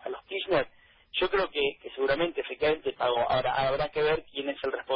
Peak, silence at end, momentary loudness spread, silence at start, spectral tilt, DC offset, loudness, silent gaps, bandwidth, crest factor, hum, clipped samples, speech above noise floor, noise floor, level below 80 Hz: -12 dBFS; 0 s; 8 LU; 0.05 s; -8.5 dB/octave; under 0.1%; -29 LUFS; none; 5.6 kHz; 16 dB; none; under 0.1%; 27 dB; -55 dBFS; -54 dBFS